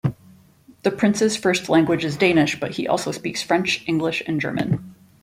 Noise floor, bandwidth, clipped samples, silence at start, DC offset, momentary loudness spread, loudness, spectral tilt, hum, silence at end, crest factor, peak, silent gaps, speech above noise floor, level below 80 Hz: -51 dBFS; 16 kHz; under 0.1%; 0.05 s; under 0.1%; 8 LU; -21 LUFS; -5 dB/octave; none; 0.3 s; 18 dB; -4 dBFS; none; 31 dB; -56 dBFS